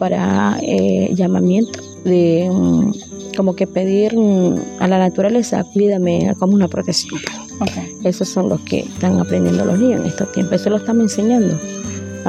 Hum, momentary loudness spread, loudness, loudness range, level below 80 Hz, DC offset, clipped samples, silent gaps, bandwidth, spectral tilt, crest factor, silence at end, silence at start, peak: none; 8 LU; -16 LUFS; 3 LU; -52 dBFS; under 0.1%; under 0.1%; none; 9.6 kHz; -6.5 dB/octave; 14 dB; 0 s; 0 s; 0 dBFS